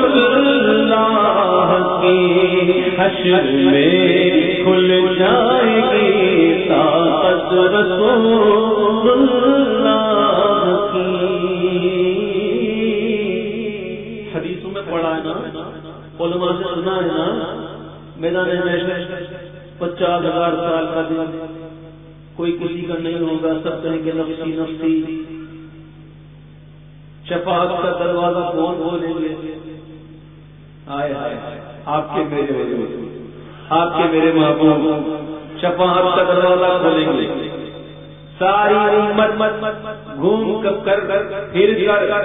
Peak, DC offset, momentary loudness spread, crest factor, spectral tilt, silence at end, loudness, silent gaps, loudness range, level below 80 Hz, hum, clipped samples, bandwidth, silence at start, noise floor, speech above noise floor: -2 dBFS; 0.2%; 16 LU; 16 dB; -9.5 dB/octave; 0 s; -16 LUFS; none; 10 LU; -48 dBFS; 50 Hz at -40 dBFS; under 0.1%; 3.9 kHz; 0 s; -40 dBFS; 25 dB